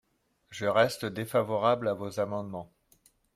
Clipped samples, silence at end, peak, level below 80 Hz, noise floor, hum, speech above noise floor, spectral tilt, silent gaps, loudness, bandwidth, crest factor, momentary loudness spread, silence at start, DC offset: under 0.1%; 0.7 s; -12 dBFS; -68 dBFS; -66 dBFS; none; 37 dB; -5.5 dB/octave; none; -29 LUFS; 16 kHz; 20 dB; 14 LU; 0.5 s; under 0.1%